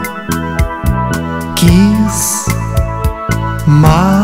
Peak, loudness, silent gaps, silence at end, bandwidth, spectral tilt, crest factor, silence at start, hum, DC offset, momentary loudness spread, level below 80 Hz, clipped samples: 0 dBFS; -12 LUFS; none; 0 s; 16.5 kHz; -5.5 dB/octave; 12 dB; 0 s; none; under 0.1%; 9 LU; -20 dBFS; 0.6%